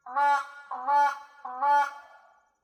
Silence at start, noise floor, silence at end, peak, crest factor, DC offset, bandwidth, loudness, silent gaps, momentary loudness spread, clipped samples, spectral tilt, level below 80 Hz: 0.05 s; -59 dBFS; 0.6 s; -14 dBFS; 14 dB; under 0.1%; 11.5 kHz; -26 LUFS; none; 14 LU; under 0.1%; 0.5 dB/octave; -90 dBFS